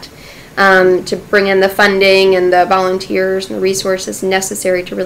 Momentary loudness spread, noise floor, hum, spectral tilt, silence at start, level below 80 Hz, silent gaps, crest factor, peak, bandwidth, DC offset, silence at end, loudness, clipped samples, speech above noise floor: 8 LU; -35 dBFS; none; -3.5 dB/octave; 0 s; -44 dBFS; none; 12 dB; 0 dBFS; 16 kHz; under 0.1%; 0 s; -12 LUFS; under 0.1%; 23 dB